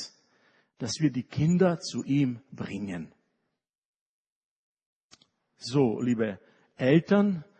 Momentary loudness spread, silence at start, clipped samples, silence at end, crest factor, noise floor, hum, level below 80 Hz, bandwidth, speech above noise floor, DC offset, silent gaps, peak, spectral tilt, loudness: 16 LU; 0 s; under 0.1%; 0.15 s; 20 dB; -82 dBFS; none; -66 dBFS; 9.4 kHz; 56 dB; under 0.1%; 3.78-4.77 s, 4.86-5.10 s; -10 dBFS; -6.5 dB/octave; -27 LUFS